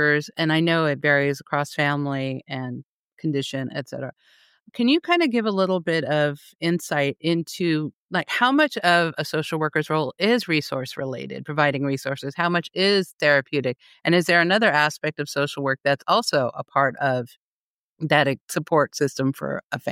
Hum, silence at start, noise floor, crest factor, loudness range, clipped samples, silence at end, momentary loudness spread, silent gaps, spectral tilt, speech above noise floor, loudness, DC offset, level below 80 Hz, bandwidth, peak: none; 0 s; under -90 dBFS; 18 dB; 4 LU; under 0.1%; 0 s; 11 LU; 2.84-3.17 s, 4.60-4.66 s, 6.55-6.59 s, 7.93-8.09 s, 13.13-13.19 s, 17.37-17.97 s, 18.41-18.48 s, 19.64-19.70 s; -5 dB/octave; over 68 dB; -22 LUFS; under 0.1%; -72 dBFS; 16.5 kHz; -6 dBFS